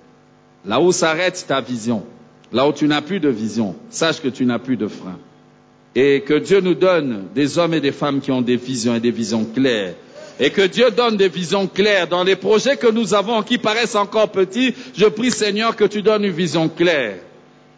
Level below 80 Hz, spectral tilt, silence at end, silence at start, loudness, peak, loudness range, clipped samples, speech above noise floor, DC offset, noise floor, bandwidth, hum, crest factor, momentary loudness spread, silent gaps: -62 dBFS; -4.5 dB/octave; 0.5 s; 0.65 s; -18 LUFS; -2 dBFS; 4 LU; under 0.1%; 33 dB; under 0.1%; -50 dBFS; 8 kHz; none; 14 dB; 8 LU; none